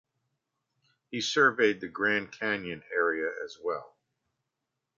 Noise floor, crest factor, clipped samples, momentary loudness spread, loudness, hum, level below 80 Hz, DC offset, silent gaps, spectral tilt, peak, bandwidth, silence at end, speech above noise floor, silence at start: -85 dBFS; 22 dB; under 0.1%; 12 LU; -29 LUFS; none; -72 dBFS; under 0.1%; none; -3.5 dB/octave; -10 dBFS; 7.6 kHz; 1.1 s; 56 dB; 1.1 s